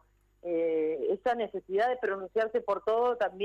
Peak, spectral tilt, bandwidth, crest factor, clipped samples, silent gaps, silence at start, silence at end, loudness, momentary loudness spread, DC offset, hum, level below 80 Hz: -20 dBFS; -6 dB/octave; 7.2 kHz; 10 dB; under 0.1%; none; 0.45 s; 0 s; -30 LUFS; 5 LU; under 0.1%; none; -68 dBFS